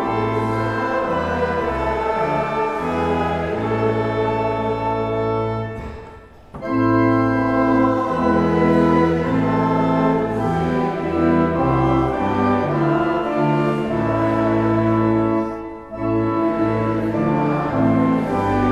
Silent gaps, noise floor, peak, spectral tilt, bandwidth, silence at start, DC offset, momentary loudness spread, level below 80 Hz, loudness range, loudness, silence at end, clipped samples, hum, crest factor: none; -41 dBFS; -4 dBFS; -8.5 dB/octave; 9.4 kHz; 0 s; under 0.1%; 5 LU; -40 dBFS; 4 LU; -19 LUFS; 0 s; under 0.1%; none; 14 dB